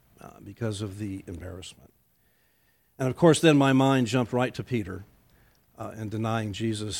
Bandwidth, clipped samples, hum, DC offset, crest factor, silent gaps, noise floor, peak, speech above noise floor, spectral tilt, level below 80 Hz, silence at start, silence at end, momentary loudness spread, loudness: 16.5 kHz; under 0.1%; none; under 0.1%; 20 dB; none; -67 dBFS; -6 dBFS; 41 dB; -6 dB/octave; -58 dBFS; 0.25 s; 0 s; 22 LU; -25 LUFS